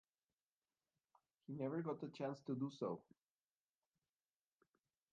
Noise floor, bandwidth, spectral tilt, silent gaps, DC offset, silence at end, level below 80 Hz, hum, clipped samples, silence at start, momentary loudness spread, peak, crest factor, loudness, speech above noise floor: under -90 dBFS; 7.2 kHz; -7.5 dB/octave; none; under 0.1%; 2.1 s; under -90 dBFS; none; under 0.1%; 1.5 s; 9 LU; -32 dBFS; 18 dB; -47 LUFS; over 44 dB